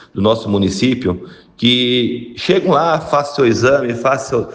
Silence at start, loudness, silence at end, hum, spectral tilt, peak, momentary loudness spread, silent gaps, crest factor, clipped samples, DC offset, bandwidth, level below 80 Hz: 0.15 s; -15 LUFS; 0 s; none; -5.5 dB/octave; 0 dBFS; 7 LU; none; 14 dB; under 0.1%; under 0.1%; 9.6 kHz; -46 dBFS